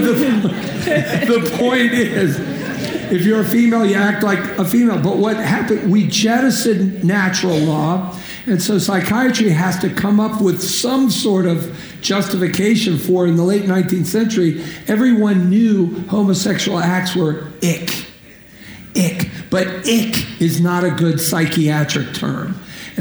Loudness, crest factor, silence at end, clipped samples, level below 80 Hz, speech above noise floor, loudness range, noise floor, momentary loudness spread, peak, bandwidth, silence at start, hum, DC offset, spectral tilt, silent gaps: -16 LUFS; 14 dB; 0 s; under 0.1%; -50 dBFS; 26 dB; 4 LU; -41 dBFS; 8 LU; -2 dBFS; over 20 kHz; 0 s; none; under 0.1%; -5 dB/octave; none